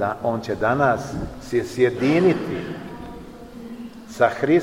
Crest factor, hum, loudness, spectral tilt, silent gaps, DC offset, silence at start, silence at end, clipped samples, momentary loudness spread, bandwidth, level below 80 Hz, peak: 18 dB; none; -21 LUFS; -7 dB/octave; none; 0.2%; 0 s; 0 s; under 0.1%; 19 LU; 15.5 kHz; -46 dBFS; -4 dBFS